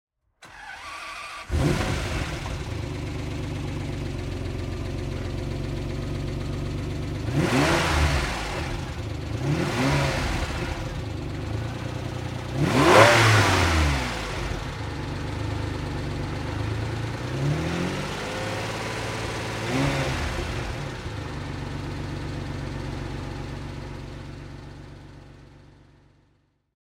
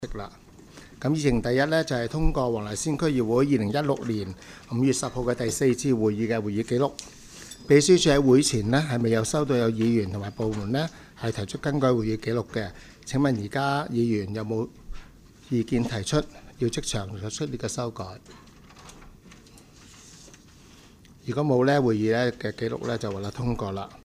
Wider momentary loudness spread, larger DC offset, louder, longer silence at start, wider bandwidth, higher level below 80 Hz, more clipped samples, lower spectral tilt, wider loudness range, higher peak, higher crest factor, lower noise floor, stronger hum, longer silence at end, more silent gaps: about the same, 14 LU vs 13 LU; neither; about the same, -26 LUFS vs -25 LUFS; first, 0.4 s vs 0 s; about the same, 16 kHz vs 15 kHz; first, -36 dBFS vs -42 dBFS; neither; about the same, -5 dB/octave vs -5.5 dB/octave; about the same, 13 LU vs 11 LU; first, -2 dBFS vs -6 dBFS; first, 26 dB vs 20 dB; first, -66 dBFS vs -51 dBFS; neither; first, 1.1 s vs 0.05 s; neither